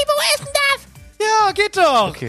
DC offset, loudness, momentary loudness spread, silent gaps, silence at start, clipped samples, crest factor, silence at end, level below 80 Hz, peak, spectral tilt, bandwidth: under 0.1%; -16 LUFS; 5 LU; none; 0 s; under 0.1%; 16 dB; 0 s; -48 dBFS; -2 dBFS; -2 dB/octave; 15.5 kHz